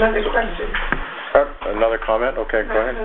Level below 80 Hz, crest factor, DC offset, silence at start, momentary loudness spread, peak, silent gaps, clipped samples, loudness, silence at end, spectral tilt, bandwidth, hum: -30 dBFS; 18 dB; under 0.1%; 0 s; 6 LU; 0 dBFS; none; under 0.1%; -20 LUFS; 0 s; -8.5 dB/octave; 4.1 kHz; none